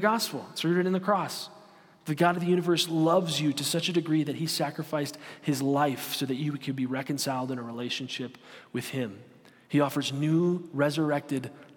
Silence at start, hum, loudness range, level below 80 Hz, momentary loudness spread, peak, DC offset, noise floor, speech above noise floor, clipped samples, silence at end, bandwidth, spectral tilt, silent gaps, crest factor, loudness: 0 s; none; 6 LU; -78 dBFS; 11 LU; -8 dBFS; under 0.1%; -55 dBFS; 26 dB; under 0.1%; 0.1 s; 17.5 kHz; -5 dB/octave; none; 20 dB; -28 LUFS